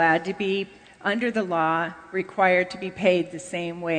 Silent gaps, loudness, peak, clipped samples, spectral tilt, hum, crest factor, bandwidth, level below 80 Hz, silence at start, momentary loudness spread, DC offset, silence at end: none; -25 LUFS; -6 dBFS; under 0.1%; -5.5 dB/octave; none; 18 dB; 9.4 kHz; -64 dBFS; 0 s; 10 LU; under 0.1%; 0 s